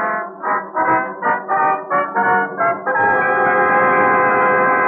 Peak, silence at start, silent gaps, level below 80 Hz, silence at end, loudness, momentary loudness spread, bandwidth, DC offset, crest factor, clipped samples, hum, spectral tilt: -4 dBFS; 0 s; none; -66 dBFS; 0 s; -16 LUFS; 7 LU; 3.5 kHz; under 0.1%; 12 dB; under 0.1%; none; -4.5 dB/octave